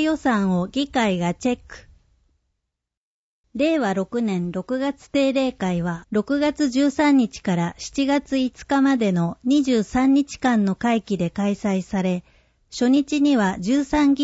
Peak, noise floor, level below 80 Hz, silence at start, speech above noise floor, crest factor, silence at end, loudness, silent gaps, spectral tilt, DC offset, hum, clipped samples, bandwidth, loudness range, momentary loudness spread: -6 dBFS; -81 dBFS; -50 dBFS; 0 s; 61 dB; 14 dB; 0 s; -21 LUFS; 2.97-3.44 s; -6 dB/octave; under 0.1%; none; under 0.1%; 8 kHz; 6 LU; 7 LU